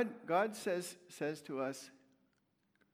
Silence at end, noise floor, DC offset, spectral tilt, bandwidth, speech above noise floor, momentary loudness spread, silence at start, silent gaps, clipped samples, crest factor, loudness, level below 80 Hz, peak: 1.05 s; -79 dBFS; under 0.1%; -4.5 dB/octave; 19.5 kHz; 40 dB; 13 LU; 0 s; none; under 0.1%; 20 dB; -39 LUFS; under -90 dBFS; -20 dBFS